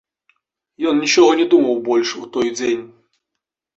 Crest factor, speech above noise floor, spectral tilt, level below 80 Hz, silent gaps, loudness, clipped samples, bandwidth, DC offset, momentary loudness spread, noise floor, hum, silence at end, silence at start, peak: 16 dB; 65 dB; -3 dB/octave; -62 dBFS; none; -16 LUFS; under 0.1%; 8 kHz; under 0.1%; 10 LU; -81 dBFS; none; 0.9 s; 0.8 s; -2 dBFS